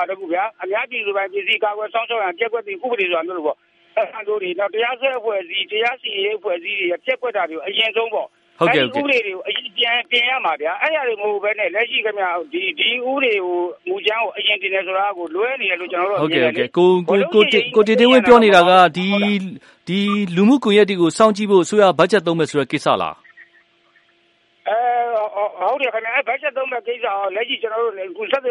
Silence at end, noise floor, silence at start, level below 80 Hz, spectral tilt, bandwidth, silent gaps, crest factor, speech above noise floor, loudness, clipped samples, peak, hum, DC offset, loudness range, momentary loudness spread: 0 s; -59 dBFS; 0 s; -64 dBFS; -5 dB/octave; 11.5 kHz; none; 18 dB; 41 dB; -18 LUFS; under 0.1%; 0 dBFS; none; under 0.1%; 8 LU; 10 LU